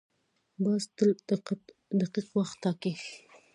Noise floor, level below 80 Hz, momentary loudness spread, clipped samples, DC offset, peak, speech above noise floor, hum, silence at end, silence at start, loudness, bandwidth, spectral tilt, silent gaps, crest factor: -68 dBFS; -78 dBFS; 12 LU; under 0.1%; under 0.1%; -12 dBFS; 38 dB; none; 0.35 s; 0.6 s; -31 LUFS; 11 kHz; -6.5 dB/octave; none; 18 dB